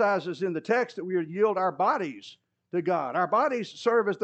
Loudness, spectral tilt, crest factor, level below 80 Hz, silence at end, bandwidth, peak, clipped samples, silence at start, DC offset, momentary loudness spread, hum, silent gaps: -27 LUFS; -6 dB/octave; 16 dB; -88 dBFS; 0 s; 8.4 kHz; -12 dBFS; under 0.1%; 0 s; under 0.1%; 6 LU; none; none